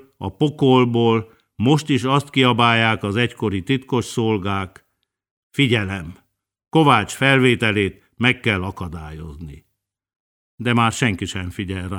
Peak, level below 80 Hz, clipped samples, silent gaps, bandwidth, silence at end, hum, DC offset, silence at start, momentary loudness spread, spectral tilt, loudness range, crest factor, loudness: 0 dBFS; -48 dBFS; under 0.1%; 5.31-5.50 s, 10.16-10.58 s; 16.5 kHz; 0 s; none; under 0.1%; 0.2 s; 16 LU; -5.5 dB/octave; 6 LU; 20 dB; -19 LUFS